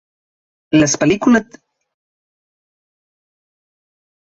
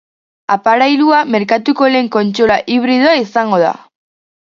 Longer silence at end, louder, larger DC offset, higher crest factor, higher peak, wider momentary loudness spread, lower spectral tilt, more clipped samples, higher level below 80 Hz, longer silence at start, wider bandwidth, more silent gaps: first, 2.9 s vs 0.75 s; about the same, -14 LUFS vs -12 LUFS; neither; first, 18 dB vs 12 dB; about the same, -2 dBFS vs 0 dBFS; about the same, 4 LU vs 5 LU; about the same, -4.5 dB/octave vs -5.5 dB/octave; neither; about the same, -52 dBFS vs -52 dBFS; first, 0.7 s vs 0.5 s; about the same, 7.8 kHz vs 7.4 kHz; neither